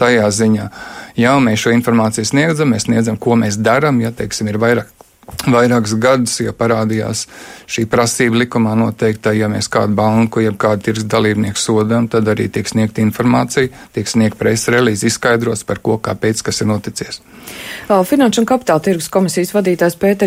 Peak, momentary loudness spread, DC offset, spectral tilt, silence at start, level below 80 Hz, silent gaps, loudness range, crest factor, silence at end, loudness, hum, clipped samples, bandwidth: 0 dBFS; 8 LU; under 0.1%; -5 dB/octave; 0 s; -46 dBFS; none; 2 LU; 14 dB; 0 s; -14 LUFS; none; under 0.1%; 16 kHz